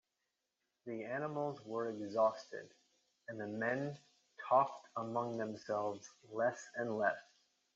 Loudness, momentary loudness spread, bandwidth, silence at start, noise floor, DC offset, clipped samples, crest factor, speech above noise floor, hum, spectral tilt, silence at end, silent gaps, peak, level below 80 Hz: -39 LUFS; 17 LU; 7.8 kHz; 0.85 s; -88 dBFS; under 0.1%; under 0.1%; 22 dB; 49 dB; none; -5 dB/octave; 0.55 s; none; -18 dBFS; -88 dBFS